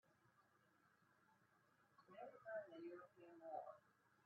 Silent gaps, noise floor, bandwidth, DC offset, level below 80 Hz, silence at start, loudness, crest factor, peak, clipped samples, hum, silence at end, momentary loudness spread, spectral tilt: none; -79 dBFS; 5.6 kHz; under 0.1%; under -90 dBFS; 0.05 s; -58 LUFS; 20 dB; -40 dBFS; under 0.1%; none; 0 s; 12 LU; -4 dB/octave